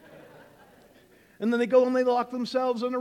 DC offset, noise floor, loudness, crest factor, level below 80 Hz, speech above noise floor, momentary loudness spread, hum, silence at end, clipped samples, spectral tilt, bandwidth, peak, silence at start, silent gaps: under 0.1%; -57 dBFS; -25 LUFS; 18 dB; -72 dBFS; 33 dB; 7 LU; none; 0 s; under 0.1%; -5.5 dB/octave; 10 kHz; -8 dBFS; 0.15 s; none